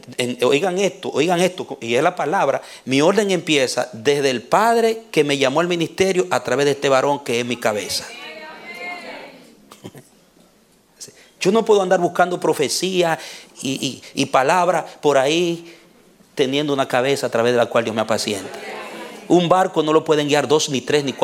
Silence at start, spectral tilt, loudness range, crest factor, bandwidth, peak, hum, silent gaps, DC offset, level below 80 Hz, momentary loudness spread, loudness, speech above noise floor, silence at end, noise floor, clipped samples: 0.05 s; -4 dB/octave; 6 LU; 18 dB; 16.5 kHz; -2 dBFS; none; none; under 0.1%; -64 dBFS; 15 LU; -18 LUFS; 37 dB; 0 s; -55 dBFS; under 0.1%